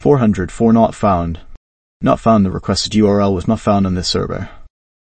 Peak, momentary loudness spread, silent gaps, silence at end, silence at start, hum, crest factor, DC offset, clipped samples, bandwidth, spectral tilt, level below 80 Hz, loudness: 0 dBFS; 11 LU; 1.57-2.00 s; 0.45 s; 0 s; none; 14 dB; under 0.1%; under 0.1%; 8.8 kHz; -6.5 dB/octave; -36 dBFS; -15 LUFS